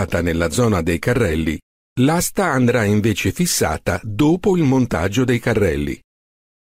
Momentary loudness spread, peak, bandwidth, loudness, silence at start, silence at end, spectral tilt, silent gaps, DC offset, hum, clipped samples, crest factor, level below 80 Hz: 7 LU; -6 dBFS; 16 kHz; -18 LUFS; 0 s; 0.7 s; -5.5 dB/octave; 1.62-1.96 s; under 0.1%; none; under 0.1%; 12 dB; -38 dBFS